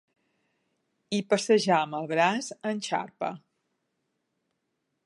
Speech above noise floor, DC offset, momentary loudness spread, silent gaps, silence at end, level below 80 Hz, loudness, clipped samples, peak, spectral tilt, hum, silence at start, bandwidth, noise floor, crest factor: 53 dB; under 0.1%; 12 LU; none; 1.65 s; -82 dBFS; -27 LUFS; under 0.1%; -8 dBFS; -4 dB/octave; none; 1.1 s; 11.5 kHz; -80 dBFS; 22 dB